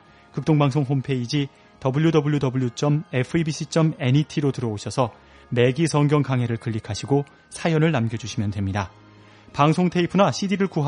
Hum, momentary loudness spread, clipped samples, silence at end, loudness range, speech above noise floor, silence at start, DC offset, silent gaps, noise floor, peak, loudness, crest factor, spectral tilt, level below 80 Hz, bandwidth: none; 9 LU; under 0.1%; 0 s; 2 LU; 27 dB; 0.35 s; under 0.1%; none; -48 dBFS; -4 dBFS; -22 LUFS; 18 dB; -6.5 dB/octave; -56 dBFS; 10.5 kHz